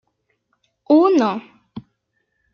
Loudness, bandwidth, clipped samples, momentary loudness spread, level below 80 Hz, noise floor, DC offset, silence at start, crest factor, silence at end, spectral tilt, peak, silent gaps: -16 LUFS; 6.8 kHz; under 0.1%; 26 LU; -68 dBFS; -71 dBFS; under 0.1%; 0.9 s; 18 dB; 0.75 s; -6.5 dB/octave; -2 dBFS; none